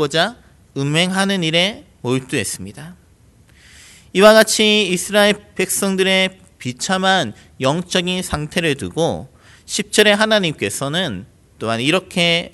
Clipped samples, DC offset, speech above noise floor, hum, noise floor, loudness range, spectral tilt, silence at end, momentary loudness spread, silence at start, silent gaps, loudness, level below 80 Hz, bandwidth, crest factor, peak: under 0.1%; under 0.1%; 33 dB; none; -50 dBFS; 5 LU; -3.5 dB/octave; 0.05 s; 13 LU; 0 s; none; -16 LUFS; -48 dBFS; 12.5 kHz; 18 dB; 0 dBFS